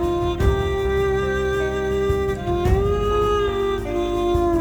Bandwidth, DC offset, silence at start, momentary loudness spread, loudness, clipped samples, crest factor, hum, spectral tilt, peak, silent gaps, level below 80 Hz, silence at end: over 20 kHz; under 0.1%; 0 s; 3 LU; -21 LUFS; under 0.1%; 14 dB; none; -7 dB/octave; -6 dBFS; none; -28 dBFS; 0 s